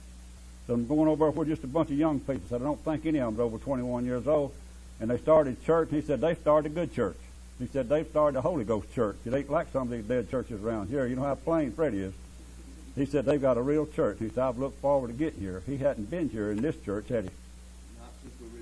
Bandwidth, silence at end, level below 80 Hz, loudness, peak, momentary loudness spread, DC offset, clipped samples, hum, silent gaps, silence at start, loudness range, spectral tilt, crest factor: 11 kHz; 0 s; -48 dBFS; -29 LUFS; -10 dBFS; 22 LU; under 0.1%; under 0.1%; none; none; 0 s; 4 LU; -7.5 dB/octave; 18 dB